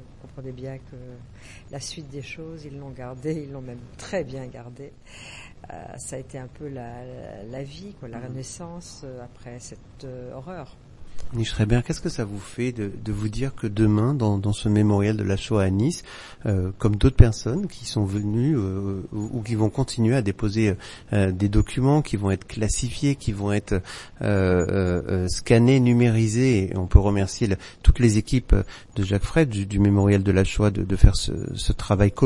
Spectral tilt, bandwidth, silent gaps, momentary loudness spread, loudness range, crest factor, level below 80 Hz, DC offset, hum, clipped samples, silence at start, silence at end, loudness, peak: -6.5 dB/octave; 11.5 kHz; none; 20 LU; 17 LU; 22 dB; -30 dBFS; under 0.1%; none; under 0.1%; 0 s; 0 s; -23 LUFS; 0 dBFS